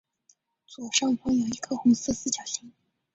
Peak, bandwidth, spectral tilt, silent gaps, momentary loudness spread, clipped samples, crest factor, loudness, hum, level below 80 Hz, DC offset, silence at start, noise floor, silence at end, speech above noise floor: -8 dBFS; 8 kHz; -3 dB/octave; none; 11 LU; under 0.1%; 20 dB; -26 LUFS; none; -58 dBFS; under 0.1%; 0.7 s; -66 dBFS; 0.45 s; 40 dB